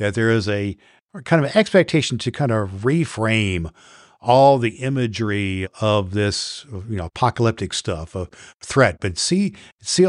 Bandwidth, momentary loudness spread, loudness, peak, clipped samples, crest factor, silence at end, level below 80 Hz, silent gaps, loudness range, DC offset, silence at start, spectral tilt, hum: 11.5 kHz; 13 LU; -20 LUFS; -2 dBFS; under 0.1%; 18 dB; 0 s; -46 dBFS; 1.01-1.07 s, 8.54-8.60 s, 9.72-9.78 s; 3 LU; under 0.1%; 0 s; -5 dB/octave; none